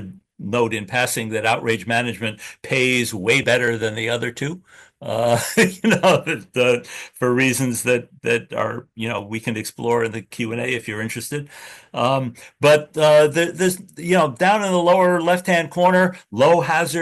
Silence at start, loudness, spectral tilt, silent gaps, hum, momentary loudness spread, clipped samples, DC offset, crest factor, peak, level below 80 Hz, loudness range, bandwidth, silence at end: 0 s; -19 LUFS; -4.5 dB/octave; none; none; 12 LU; under 0.1%; under 0.1%; 16 dB; -2 dBFS; -60 dBFS; 7 LU; 13 kHz; 0 s